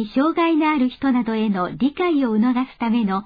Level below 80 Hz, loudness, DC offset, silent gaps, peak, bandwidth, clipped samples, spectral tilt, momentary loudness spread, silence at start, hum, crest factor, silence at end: -54 dBFS; -20 LUFS; under 0.1%; none; -8 dBFS; 5 kHz; under 0.1%; -9 dB/octave; 4 LU; 0 s; none; 12 dB; 0 s